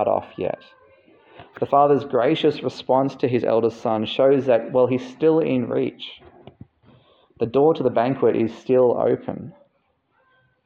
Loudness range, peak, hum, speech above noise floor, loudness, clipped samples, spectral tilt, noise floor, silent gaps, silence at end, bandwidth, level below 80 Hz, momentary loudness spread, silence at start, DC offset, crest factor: 3 LU; -4 dBFS; none; 47 dB; -20 LUFS; under 0.1%; -8 dB/octave; -67 dBFS; none; 1.15 s; 7.2 kHz; -64 dBFS; 11 LU; 0 s; under 0.1%; 16 dB